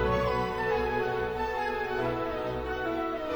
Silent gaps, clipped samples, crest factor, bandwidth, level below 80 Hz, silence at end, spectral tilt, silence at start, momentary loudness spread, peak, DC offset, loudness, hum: none; under 0.1%; 16 dB; over 20 kHz; -44 dBFS; 0 s; -6.5 dB/octave; 0 s; 4 LU; -14 dBFS; under 0.1%; -30 LUFS; none